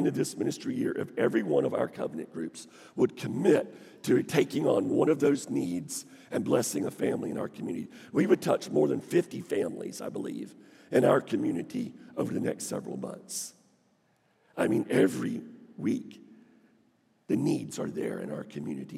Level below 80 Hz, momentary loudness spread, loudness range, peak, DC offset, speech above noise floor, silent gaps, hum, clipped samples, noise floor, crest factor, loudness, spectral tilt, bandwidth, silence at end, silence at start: -80 dBFS; 13 LU; 7 LU; -8 dBFS; under 0.1%; 40 dB; none; none; under 0.1%; -69 dBFS; 22 dB; -30 LUFS; -5.5 dB/octave; 16 kHz; 0 s; 0 s